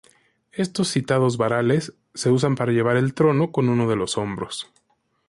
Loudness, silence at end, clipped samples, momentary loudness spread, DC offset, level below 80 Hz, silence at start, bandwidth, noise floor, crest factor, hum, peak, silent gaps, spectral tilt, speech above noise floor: -22 LUFS; 0.65 s; under 0.1%; 11 LU; under 0.1%; -56 dBFS; 0.55 s; 11.5 kHz; -58 dBFS; 14 dB; none; -8 dBFS; none; -6 dB/octave; 37 dB